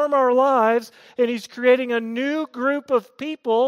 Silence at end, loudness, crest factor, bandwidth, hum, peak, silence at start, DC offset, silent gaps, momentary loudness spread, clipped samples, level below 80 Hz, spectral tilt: 0 s; -21 LUFS; 16 dB; 13 kHz; none; -6 dBFS; 0 s; under 0.1%; none; 8 LU; under 0.1%; -80 dBFS; -4.5 dB/octave